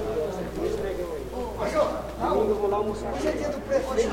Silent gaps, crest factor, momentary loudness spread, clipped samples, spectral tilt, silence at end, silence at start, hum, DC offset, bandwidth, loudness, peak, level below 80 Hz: none; 16 dB; 7 LU; under 0.1%; -5.5 dB/octave; 0 s; 0 s; none; under 0.1%; 16.5 kHz; -28 LUFS; -12 dBFS; -42 dBFS